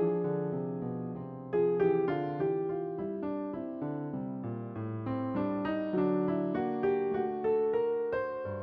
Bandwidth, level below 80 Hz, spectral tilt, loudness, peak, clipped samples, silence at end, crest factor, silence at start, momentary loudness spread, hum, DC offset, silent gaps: 5.2 kHz; -66 dBFS; -8 dB/octave; -33 LUFS; -16 dBFS; under 0.1%; 0 s; 14 dB; 0 s; 9 LU; none; under 0.1%; none